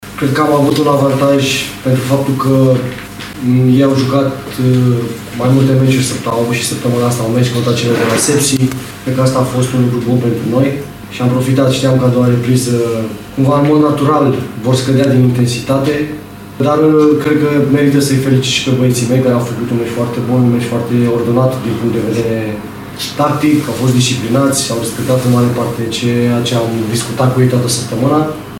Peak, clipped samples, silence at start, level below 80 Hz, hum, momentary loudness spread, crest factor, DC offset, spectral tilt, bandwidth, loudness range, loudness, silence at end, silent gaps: 0 dBFS; under 0.1%; 0 s; -44 dBFS; none; 7 LU; 12 dB; under 0.1%; -6 dB/octave; 17 kHz; 2 LU; -12 LUFS; 0 s; none